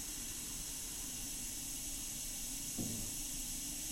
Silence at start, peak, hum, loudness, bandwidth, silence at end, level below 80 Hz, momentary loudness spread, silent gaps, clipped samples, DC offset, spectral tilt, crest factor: 0 s; -26 dBFS; none; -41 LUFS; 16 kHz; 0 s; -54 dBFS; 2 LU; none; under 0.1%; under 0.1%; -1.5 dB/octave; 16 dB